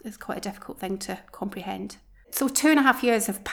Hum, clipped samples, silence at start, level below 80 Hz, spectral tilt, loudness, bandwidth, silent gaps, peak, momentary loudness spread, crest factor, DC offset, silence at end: none; under 0.1%; 0.05 s; -58 dBFS; -3 dB/octave; -25 LUFS; over 20 kHz; none; -6 dBFS; 17 LU; 22 dB; under 0.1%; 0 s